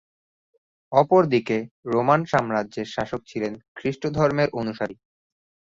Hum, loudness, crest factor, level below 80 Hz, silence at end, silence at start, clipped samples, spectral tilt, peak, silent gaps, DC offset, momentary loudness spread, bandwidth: none; -23 LUFS; 22 dB; -58 dBFS; 0.8 s; 0.9 s; under 0.1%; -7 dB/octave; -2 dBFS; 1.71-1.83 s, 3.68-3.75 s; under 0.1%; 12 LU; 7.6 kHz